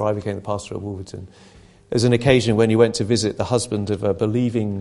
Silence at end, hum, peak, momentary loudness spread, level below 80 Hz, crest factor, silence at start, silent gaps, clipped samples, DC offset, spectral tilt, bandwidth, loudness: 0 s; none; 0 dBFS; 14 LU; -44 dBFS; 20 dB; 0 s; none; under 0.1%; under 0.1%; -6 dB/octave; 11.5 kHz; -20 LUFS